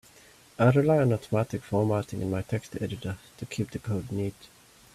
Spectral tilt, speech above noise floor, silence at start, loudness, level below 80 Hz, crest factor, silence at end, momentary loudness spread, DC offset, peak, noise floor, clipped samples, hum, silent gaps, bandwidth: -7.5 dB/octave; 28 dB; 0.6 s; -28 LUFS; -58 dBFS; 18 dB; 0.65 s; 14 LU; under 0.1%; -10 dBFS; -55 dBFS; under 0.1%; none; none; 14 kHz